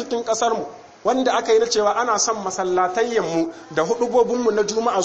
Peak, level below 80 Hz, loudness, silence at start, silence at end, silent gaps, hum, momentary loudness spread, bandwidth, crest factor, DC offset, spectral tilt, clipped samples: -6 dBFS; -58 dBFS; -20 LUFS; 0 s; 0 s; none; none; 7 LU; 8.6 kHz; 14 dB; under 0.1%; -3 dB/octave; under 0.1%